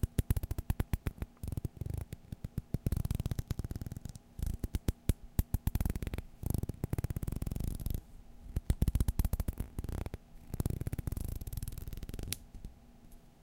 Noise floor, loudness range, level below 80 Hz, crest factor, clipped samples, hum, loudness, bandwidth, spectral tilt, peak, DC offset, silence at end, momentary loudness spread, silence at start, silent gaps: -56 dBFS; 3 LU; -40 dBFS; 24 dB; under 0.1%; none; -39 LUFS; 17 kHz; -6.5 dB/octave; -12 dBFS; under 0.1%; 0.1 s; 11 LU; 0 s; none